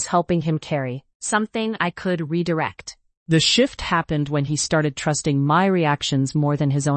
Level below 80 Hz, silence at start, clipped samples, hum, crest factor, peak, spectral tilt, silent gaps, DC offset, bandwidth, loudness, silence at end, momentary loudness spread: -50 dBFS; 0 s; under 0.1%; none; 16 dB; -4 dBFS; -5 dB/octave; 1.15-1.20 s, 3.17-3.26 s; under 0.1%; 8.8 kHz; -21 LUFS; 0 s; 8 LU